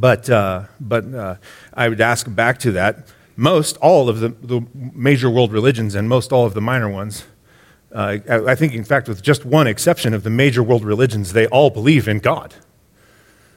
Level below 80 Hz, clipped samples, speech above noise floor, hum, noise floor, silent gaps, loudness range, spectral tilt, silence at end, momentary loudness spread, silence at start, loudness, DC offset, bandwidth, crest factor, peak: -52 dBFS; under 0.1%; 37 dB; none; -53 dBFS; none; 4 LU; -6 dB/octave; 1.1 s; 12 LU; 0 s; -16 LUFS; under 0.1%; 16.5 kHz; 16 dB; 0 dBFS